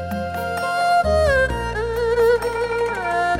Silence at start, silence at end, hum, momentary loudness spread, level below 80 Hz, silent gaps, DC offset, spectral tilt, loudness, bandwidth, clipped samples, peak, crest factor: 0 s; 0 s; none; 7 LU; -34 dBFS; none; under 0.1%; -5 dB/octave; -20 LUFS; 17 kHz; under 0.1%; -8 dBFS; 12 dB